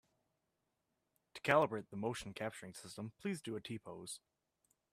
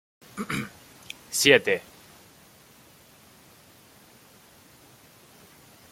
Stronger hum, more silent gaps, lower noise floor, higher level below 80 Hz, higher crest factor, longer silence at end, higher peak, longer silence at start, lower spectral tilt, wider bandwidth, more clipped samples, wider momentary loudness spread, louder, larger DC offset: neither; neither; first, -86 dBFS vs -54 dBFS; second, -76 dBFS vs -66 dBFS; about the same, 28 dB vs 28 dB; second, 0.75 s vs 4.1 s; second, -16 dBFS vs -2 dBFS; first, 1.35 s vs 0.35 s; first, -5 dB/octave vs -2.5 dB/octave; about the same, 15 kHz vs 16.5 kHz; neither; second, 18 LU vs 27 LU; second, -40 LUFS vs -23 LUFS; neither